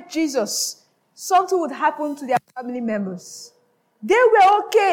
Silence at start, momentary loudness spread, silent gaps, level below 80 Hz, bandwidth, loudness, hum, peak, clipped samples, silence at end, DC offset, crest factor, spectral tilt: 0 s; 19 LU; none; -68 dBFS; 17 kHz; -19 LUFS; none; -4 dBFS; under 0.1%; 0 s; under 0.1%; 16 dB; -3 dB/octave